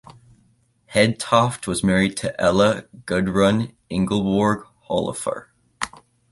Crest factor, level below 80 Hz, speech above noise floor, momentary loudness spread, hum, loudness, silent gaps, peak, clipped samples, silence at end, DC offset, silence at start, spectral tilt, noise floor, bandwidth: 20 dB; -48 dBFS; 41 dB; 11 LU; none; -21 LUFS; none; -2 dBFS; under 0.1%; 0.45 s; under 0.1%; 0.9 s; -5 dB/octave; -61 dBFS; 11.5 kHz